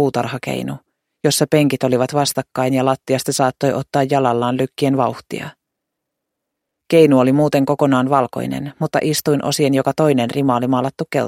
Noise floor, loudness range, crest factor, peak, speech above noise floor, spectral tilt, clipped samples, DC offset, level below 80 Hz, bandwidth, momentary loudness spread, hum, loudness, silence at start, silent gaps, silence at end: -78 dBFS; 3 LU; 16 dB; 0 dBFS; 62 dB; -5.5 dB/octave; under 0.1%; under 0.1%; -58 dBFS; 16.5 kHz; 9 LU; none; -17 LUFS; 0 s; none; 0 s